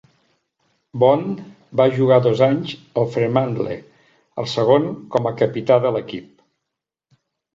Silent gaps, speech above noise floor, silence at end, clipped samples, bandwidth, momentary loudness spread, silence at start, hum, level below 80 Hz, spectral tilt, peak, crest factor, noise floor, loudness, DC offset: none; 64 dB; 1.3 s; under 0.1%; 7.6 kHz; 16 LU; 0.95 s; none; -60 dBFS; -7.5 dB/octave; -2 dBFS; 18 dB; -82 dBFS; -19 LUFS; under 0.1%